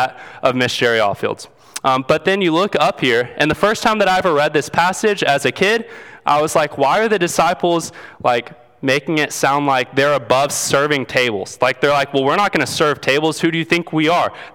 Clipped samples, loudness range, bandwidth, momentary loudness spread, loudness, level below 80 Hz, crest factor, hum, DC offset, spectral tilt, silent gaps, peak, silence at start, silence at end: under 0.1%; 2 LU; 19 kHz; 6 LU; -16 LUFS; -52 dBFS; 16 dB; none; under 0.1%; -4 dB/octave; none; 0 dBFS; 0 s; 0.05 s